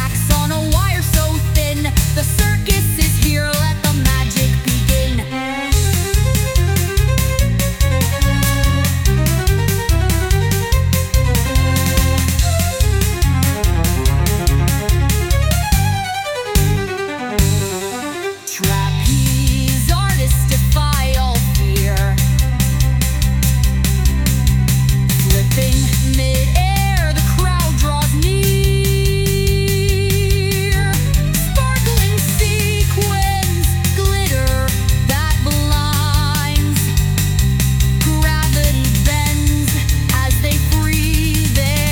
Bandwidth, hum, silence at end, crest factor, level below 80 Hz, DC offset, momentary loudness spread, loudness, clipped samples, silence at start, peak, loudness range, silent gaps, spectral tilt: 19.5 kHz; none; 0 s; 14 dB; -18 dBFS; under 0.1%; 2 LU; -16 LUFS; under 0.1%; 0 s; 0 dBFS; 1 LU; none; -4.5 dB/octave